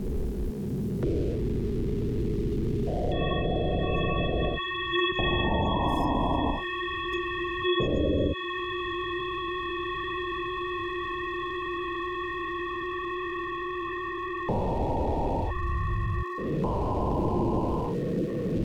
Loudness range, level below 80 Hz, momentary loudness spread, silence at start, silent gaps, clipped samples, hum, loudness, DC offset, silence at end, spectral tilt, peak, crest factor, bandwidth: 5 LU; -36 dBFS; 6 LU; 0 s; none; under 0.1%; none; -29 LUFS; 0.1%; 0 s; -7.5 dB/octave; -14 dBFS; 14 dB; 17.5 kHz